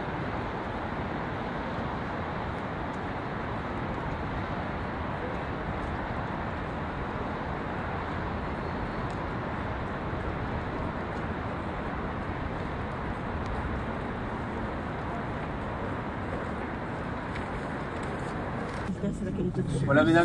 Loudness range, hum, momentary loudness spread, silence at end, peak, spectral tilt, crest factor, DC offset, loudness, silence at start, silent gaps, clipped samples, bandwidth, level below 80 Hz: 1 LU; none; 2 LU; 0 s; -8 dBFS; -7.5 dB/octave; 24 dB; under 0.1%; -33 LUFS; 0 s; none; under 0.1%; 11 kHz; -42 dBFS